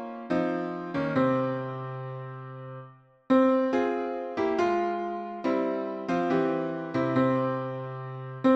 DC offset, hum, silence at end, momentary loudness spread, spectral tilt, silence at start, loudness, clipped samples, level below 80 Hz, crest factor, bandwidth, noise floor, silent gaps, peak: under 0.1%; none; 0 s; 13 LU; -8 dB/octave; 0 s; -28 LUFS; under 0.1%; -68 dBFS; 16 dB; 7.2 kHz; -51 dBFS; none; -12 dBFS